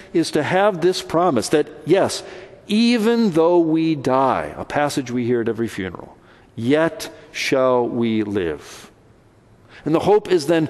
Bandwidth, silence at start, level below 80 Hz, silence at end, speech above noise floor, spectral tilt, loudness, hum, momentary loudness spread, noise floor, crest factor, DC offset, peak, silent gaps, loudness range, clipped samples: 12.5 kHz; 0 s; -54 dBFS; 0 s; 33 dB; -5.5 dB/octave; -19 LUFS; none; 13 LU; -51 dBFS; 16 dB; under 0.1%; -4 dBFS; none; 4 LU; under 0.1%